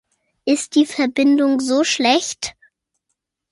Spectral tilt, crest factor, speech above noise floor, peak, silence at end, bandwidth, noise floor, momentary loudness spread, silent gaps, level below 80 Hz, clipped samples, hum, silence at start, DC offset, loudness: -2 dB/octave; 16 dB; 59 dB; -4 dBFS; 1 s; 11.5 kHz; -76 dBFS; 12 LU; none; -64 dBFS; under 0.1%; none; 0.45 s; under 0.1%; -17 LUFS